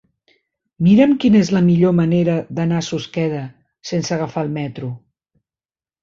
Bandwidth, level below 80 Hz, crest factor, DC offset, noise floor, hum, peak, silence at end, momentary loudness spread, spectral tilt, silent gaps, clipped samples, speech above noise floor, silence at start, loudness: 7.6 kHz; -52 dBFS; 16 dB; under 0.1%; under -90 dBFS; none; -2 dBFS; 1.05 s; 16 LU; -7 dB/octave; none; under 0.1%; over 74 dB; 0.8 s; -17 LUFS